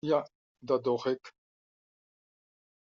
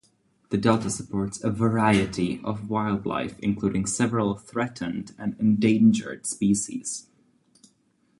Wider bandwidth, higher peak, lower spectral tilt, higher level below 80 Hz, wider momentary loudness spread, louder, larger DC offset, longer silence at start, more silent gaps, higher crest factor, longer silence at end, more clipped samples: second, 7.2 kHz vs 11.5 kHz; second, -14 dBFS vs -6 dBFS; about the same, -5 dB/octave vs -5.5 dB/octave; second, -78 dBFS vs -54 dBFS; first, 18 LU vs 11 LU; second, -32 LUFS vs -25 LUFS; neither; second, 0.05 s vs 0.5 s; first, 0.35-0.55 s vs none; about the same, 22 dB vs 20 dB; first, 1.65 s vs 1.2 s; neither